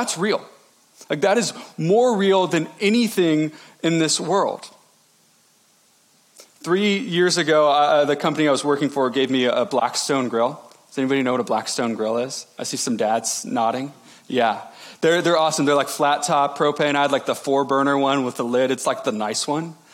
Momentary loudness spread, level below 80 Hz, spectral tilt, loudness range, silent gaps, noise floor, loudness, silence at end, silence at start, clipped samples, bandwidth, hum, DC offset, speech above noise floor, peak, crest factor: 9 LU; -80 dBFS; -4 dB/octave; 5 LU; none; -58 dBFS; -20 LUFS; 0.2 s; 0 s; under 0.1%; 17 kHz; none; under 0.1%; 38 dB; -6 dBFS; 14 dB